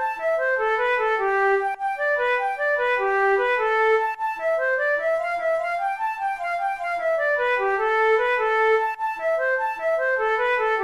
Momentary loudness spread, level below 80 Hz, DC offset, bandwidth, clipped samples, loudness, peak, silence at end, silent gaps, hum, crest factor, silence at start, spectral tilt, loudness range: 6 LU; -58 dBFS; 0.1%; 13 kHz; under 0.1%; -22 LUFS; -12 dBFS; 0 s; none; none; 10 dB; 0 s; -3 dB/octave; 2 LU